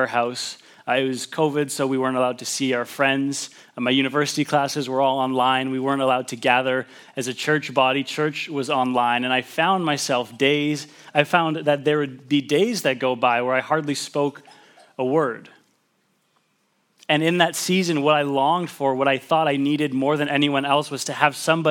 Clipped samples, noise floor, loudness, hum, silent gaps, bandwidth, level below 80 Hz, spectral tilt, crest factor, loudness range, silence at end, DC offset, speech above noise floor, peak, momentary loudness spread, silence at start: under 0.1%; -67 dBFS; -21 LUFS; none; none; 19 kHz; -80 dBFS; -4 dB/octave; 22 dB; 3 LU; 0 s; under 0.1%; 46 dB; 0 dBFS; 7 LU; 0 s